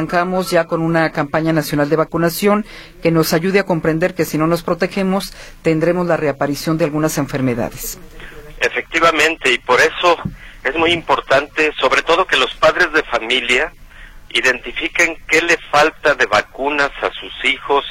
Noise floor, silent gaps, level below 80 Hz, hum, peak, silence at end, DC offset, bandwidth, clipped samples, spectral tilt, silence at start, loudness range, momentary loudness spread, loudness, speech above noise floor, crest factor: -37 dBFS; none; -40 dBFS; none; 0 dBFS; 0 s; under 0.1%; 16.5 kHz; under 0.1%; -4.5 dB/octave; 0 s; 3 LU; 8 LU; -16 LUFS; 21 dB; 16 dB